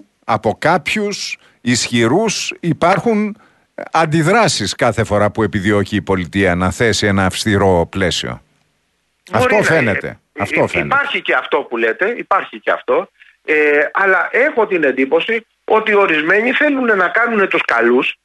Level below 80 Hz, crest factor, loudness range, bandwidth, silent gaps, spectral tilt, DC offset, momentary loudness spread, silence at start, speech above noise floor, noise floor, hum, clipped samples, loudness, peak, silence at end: -46 dBFS; 14 dB; 3 LU; 12 kHz; none; -4.5 dB/octave; under 0.1%; 7 LU; 0.25 s; 50 dB; -64 dBFS; none; under 0.1%; -15 LUFS; 0 dBFS; 0.1 s